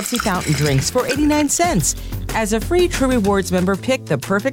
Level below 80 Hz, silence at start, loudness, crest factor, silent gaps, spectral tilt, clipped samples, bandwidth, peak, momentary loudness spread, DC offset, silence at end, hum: -32 dBFS; 0 s; -18 LUFS; 12 dB; none; -4.5 dB/octave; under 0.1%; 17 kHz; -6 dBFS; 5 LU; under 0.1%; 0 s; none